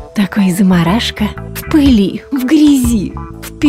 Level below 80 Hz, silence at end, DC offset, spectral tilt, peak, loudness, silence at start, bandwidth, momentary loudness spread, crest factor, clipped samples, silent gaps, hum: -28 dBFS; 0 s; under 0.1%; -6 dB/octave; 0 dBFS; -12 LUFS; 0 s; 16.5 kHz; 13 LU; 10 dB; under 0.1%; none; none